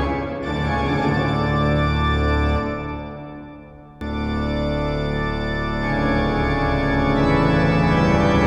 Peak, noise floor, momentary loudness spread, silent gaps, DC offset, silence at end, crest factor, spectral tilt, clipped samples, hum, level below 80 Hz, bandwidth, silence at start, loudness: -4 dBFS; -41 dBFS; 12 LU; none; under 0.1%; 0 s; 16 dB; -7.5 dB/octave; under 0.1%; none; -28 dBFS; 9.4 kHz; 0 s; -20 LUFS